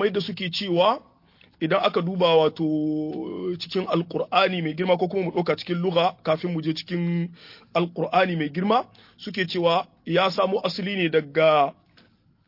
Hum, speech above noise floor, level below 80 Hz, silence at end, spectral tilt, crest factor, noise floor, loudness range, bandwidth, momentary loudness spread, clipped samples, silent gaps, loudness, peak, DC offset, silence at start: none; 35 dB; -68 dBFS; 0.75 s; -7 dB/octave; 18 dB; -58 dBFS; 2 LU; 5.8 kHz; 9 LU; under 0.1%; none; -24 LUFS; -6 dBFS; under 0.1%; 0 s